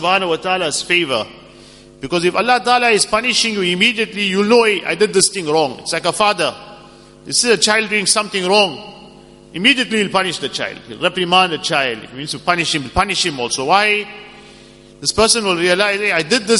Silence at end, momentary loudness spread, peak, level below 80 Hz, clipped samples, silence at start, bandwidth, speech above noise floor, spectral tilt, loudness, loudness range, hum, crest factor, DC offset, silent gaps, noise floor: 0 s; 9 LU; 0 dBFS; -46 dBFS; under 0.1%; 0 s; 11.5 kHz; 26 dB; -2.5 dB/octave; -15 LUFS; 3 LU; none; 16 dB; under 0.1%; none; -42 dBFS